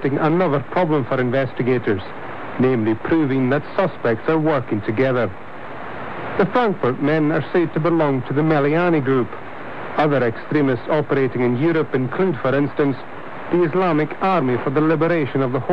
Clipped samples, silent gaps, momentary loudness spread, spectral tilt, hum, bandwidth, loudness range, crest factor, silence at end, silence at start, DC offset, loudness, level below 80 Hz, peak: under 0.1%; none; 11 LU; -9.5 dB/octave; none; 6 kHz; 2 LU; 12 dB; 0 s; 0 s; 2%; -19 LUFS; -56 dBFS; -6 dBFS